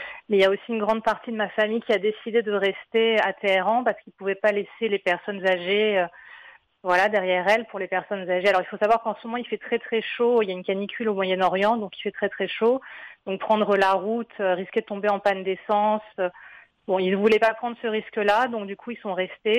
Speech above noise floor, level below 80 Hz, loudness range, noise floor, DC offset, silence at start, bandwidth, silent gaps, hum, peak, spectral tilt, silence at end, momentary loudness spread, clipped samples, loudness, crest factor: 26 dB; -68 dBFS; 2 LU; -50 dBFS; under 0.1%; 0 s; 11.5 kHz; none; none; -10 dBFS; -5.5 dB/octave; 0 s; 9 LU; under 0.1%; -24 LUFS; 14 dB